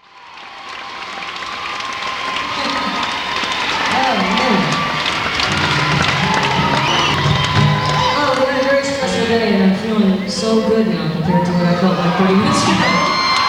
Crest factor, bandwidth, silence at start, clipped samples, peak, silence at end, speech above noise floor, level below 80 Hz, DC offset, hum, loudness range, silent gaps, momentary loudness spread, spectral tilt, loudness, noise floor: 12 dB; 16 kHz; 0.15 s; under 0.1%; -4 dBFS; 0 s; 23 dB; -42 dBFS; under 0.1%; none; 4 LU; none; 9 LU; -4.5 dB/octave; -15 LUFS; -37 dBFS